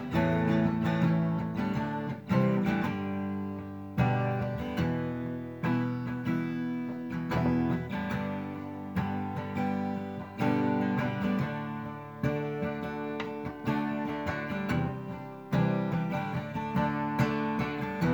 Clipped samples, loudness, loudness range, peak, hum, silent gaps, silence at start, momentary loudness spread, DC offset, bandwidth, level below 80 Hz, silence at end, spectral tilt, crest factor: under 0.1%; -31 LUFS; 3 LU; -14 dBFS; none; none; 0 s; 9 LU; under 0.1%; over 20 kHz; -54 dBFS; 0 s; -8.5 dB/octave; 16 dB